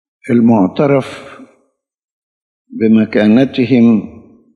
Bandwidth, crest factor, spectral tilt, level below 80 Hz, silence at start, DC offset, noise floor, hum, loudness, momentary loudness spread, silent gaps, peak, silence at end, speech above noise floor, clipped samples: 6.4 kHz; 14 dB; -8.5 dB/octave; -58 dBFS; 0.25 s; under 0.1%; -61 dBFS; none; -11 LUFS; 18 LU; 2.04-2.65 s; 0 dBFS; 0.45 s; 51 dB; under 0.1%